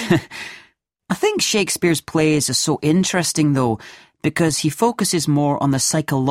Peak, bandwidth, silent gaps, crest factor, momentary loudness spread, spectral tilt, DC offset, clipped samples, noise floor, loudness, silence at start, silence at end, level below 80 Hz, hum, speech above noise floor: -2 dBFS; 16 kHz; none; 16 dB; 7 LU; -4 dB/octave; under 0.1%; under 0.1%; -54 dBFS; -18 LUFS; 0 s; 0 s; -52 dBFS; none; 36 dB